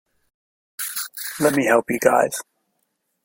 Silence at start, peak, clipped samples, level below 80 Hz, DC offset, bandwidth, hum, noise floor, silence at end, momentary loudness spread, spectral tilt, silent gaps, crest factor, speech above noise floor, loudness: 0.8 s; -2 dBFS; under 0.1%; -64 dBFS; under 0.1%; 17 kHz; none; -73 dBFS; 0.8 s; 13 LU; -3.5 dB/octave; none; 20 dB; 54 dB; -20 LUFS